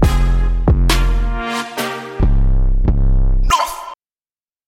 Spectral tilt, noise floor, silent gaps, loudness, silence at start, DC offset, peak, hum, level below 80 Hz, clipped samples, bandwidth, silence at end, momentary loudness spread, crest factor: -5.5 dB/octave; under -90 dBFS; none; -18 LUFS; 0 s; under 0.1%; -2 dBFS; none; -16 dBFS; under 0.1%; 15.5 kHz; 0.75 s; 7 LU; 12 dB